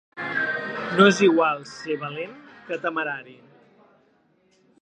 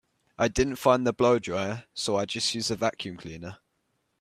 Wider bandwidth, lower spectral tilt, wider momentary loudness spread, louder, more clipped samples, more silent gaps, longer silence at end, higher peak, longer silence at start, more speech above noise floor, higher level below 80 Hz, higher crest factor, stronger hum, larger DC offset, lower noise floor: second, 9.6 kHz vs 15.5 kHz; about the same, -5 dB/octave vs -4 dB/octave; about the same, 17 LU vs 16 LU; first, -23 LUFS vs -26 LUFS; neither; neither; first, 1.5 s vs 0.65 s; first, -2 dBFS vs -8 dBFS; second, 0.15 s vs 0.4 s; second, 41 dB vs 48 dB; second, -70 dBFS vs -50 dBFS; about the same, 22 dB vs 20 dB; neither; neither; second, -63 dBFS vs -75 dBFS